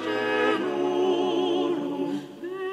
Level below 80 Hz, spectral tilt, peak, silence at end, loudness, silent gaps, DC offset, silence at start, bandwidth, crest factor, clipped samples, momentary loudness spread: -72 dBFS; -5 dB/octave; -12 dBFS; 0 s; -26 LUFS; none; under 0.1%; 0 s; 10.5 kHz; 14 dB; under 0.1%; 9 LU